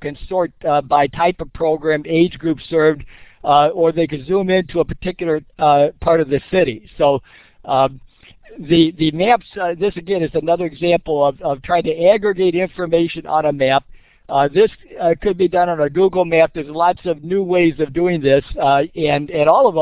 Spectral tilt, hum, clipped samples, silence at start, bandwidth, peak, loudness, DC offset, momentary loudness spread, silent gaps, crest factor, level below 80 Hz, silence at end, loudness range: -10 dB/octave; none; under 0.1%; 0 s; 4 kHz; -2 dBFS; -17 LUFS; under 0.1%; 7 LU; none; 16 dB; -42 dBFS; 0 s; 2 LU